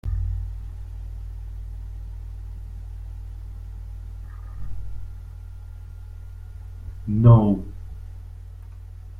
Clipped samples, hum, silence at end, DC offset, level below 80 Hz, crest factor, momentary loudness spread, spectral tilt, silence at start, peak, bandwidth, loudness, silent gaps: under 0.1%; none; 0 s; under 0.1%; -34 dBFS; 24 dB; 21 LU; -11 dB/octave; 0.05 s; -2 dBFS; 3.4 kHz; -23 LUFS; none